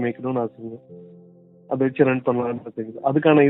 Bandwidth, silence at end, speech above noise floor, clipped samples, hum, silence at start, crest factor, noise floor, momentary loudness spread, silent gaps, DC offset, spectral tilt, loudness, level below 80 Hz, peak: 4 kHz; 0 s; 28 dB; under 0.1%; none; 0 s; 18 dB; -49 dBFS; 18 LU; none; under 0.1%; -11.5 dB/octave; -23 LUFS; -68 dBFS; -4 dBFS